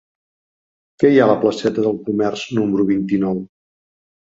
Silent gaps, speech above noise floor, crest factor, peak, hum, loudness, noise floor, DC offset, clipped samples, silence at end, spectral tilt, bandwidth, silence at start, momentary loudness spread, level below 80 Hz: none; over 74 dB; 18 dB; -2 dBFS; none; -17 LUFS; under -90 dBFS; under 0.1%; under 0.1%; 0.9 s; -7 dB/octave; 7.8 kHz; 1 s; 7 LU; -56 dBFS